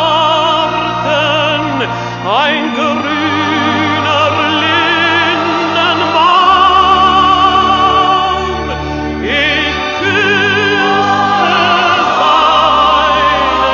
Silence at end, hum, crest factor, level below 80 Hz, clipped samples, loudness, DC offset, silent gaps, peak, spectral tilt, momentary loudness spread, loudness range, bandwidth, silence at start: 0 s; none; 10 dB; -34 dBFS; under 0.1%; -10 LUFS; under 0.1%; none; 0 dBFS; -4 dB/octave; 6 LU; 4 LU; 7.4 kHz; 0 s